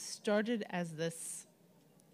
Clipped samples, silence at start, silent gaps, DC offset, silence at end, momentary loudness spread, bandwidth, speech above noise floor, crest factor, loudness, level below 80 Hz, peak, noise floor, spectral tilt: under 0.1%; 0 s; none; under 0.1%; 0.7 s; 10 LU; 15.5 kHz; 29 dB; 18 dB; -38 LUFS; -90 dBFS; -22 dBFS; -66 dBFS; -4.5 dB/octave